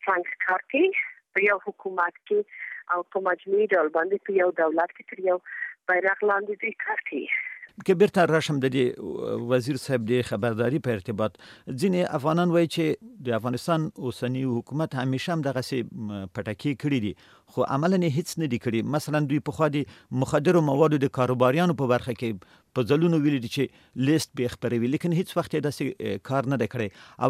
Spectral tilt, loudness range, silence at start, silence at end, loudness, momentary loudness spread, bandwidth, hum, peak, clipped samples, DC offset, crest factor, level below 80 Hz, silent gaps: -6.5 dB/octave; 4 LU; 0.05 s; 0 s; -26 LUFS; 10 LU; 15.5 kHz; none; -6 dBFS; under 0.1%; under 0.1%; 20 dB; -64 dBFS; none